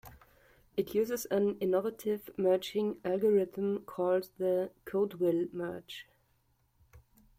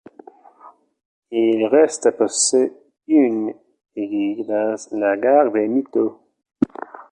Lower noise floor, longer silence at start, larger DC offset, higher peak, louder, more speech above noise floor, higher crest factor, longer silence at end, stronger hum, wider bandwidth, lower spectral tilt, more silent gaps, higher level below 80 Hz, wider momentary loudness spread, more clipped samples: first, -72 dBFS vs -48 dBFS; second, 0.05 s vs 0.65 s; neither; second, -18 dBFS vs -2 dBFS; second, -32 LUFS vs -19 LUFS; first, 41 dB vs 30 dB; about the same, 16 dB vs 18 dB; first, 0.4 s vs 0.1 s; neither; first, 16.5 kHz vs 10.5 kHz; first, -6 dB/octave vs -3.5 dB/octave; second, none vs 1.05-1.22 s; about the same, -68 dBFS vs -64 dBFS; about the same, 9 LU vs 10 LU; neither